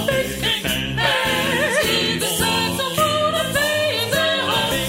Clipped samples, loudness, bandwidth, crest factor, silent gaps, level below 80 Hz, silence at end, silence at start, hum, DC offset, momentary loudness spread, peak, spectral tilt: under 0.1%; -18 LUFS; 16.5 kHz; 14 dB; none; -42 dBFS; 0 s; 0 s; none; under 0.1%; 3 LU; -6 dBFS; -3 dB/octave